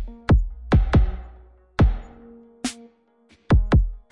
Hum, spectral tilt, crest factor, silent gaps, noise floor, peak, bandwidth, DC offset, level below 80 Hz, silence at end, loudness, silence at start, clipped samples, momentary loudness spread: none; -7 dB/octave; 14 dB; none; -58 dBFS; -6 dBFS; 11.5 kHz; under 0.1%; -24 dBFS; 0.15 s; -22 LUFS; 0 s; under 0.1%; 14 LU